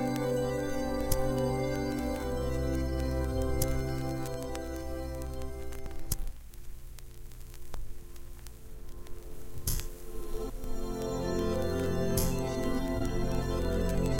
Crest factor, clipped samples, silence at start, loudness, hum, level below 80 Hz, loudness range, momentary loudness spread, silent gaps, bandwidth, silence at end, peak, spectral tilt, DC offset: 20 dB; under 0.1%; 0 s; -34 LUFS; none; -38 dBFS; 12 LU; 19 LU; none; 17 kHz; 0 s; -12 dBFS; -5.5 dB/octave; under 0.1%